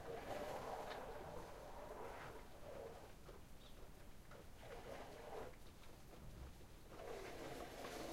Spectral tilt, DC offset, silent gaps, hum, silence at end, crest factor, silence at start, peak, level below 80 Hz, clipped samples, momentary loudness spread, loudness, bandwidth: -4.5 dB/octave; under 0.1%; none; none; 0 s; 18 dB; 0 s; -36 dBFS; -62 dBFS; under 0.1%; 12 LU; -55 LUFS; 16 kHz